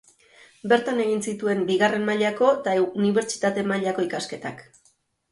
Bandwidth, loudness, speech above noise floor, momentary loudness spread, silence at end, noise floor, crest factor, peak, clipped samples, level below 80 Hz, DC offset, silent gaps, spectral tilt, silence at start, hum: 11.5 kHz; -23 LUFS; 42 dB; 9 LU; 0.7 s; -65 dBFS; 18 dB; -6 dBFS; under 0.1%; -68 dBFS; under 0.1%; none; -4.5 dB/octave; 0.65 s; none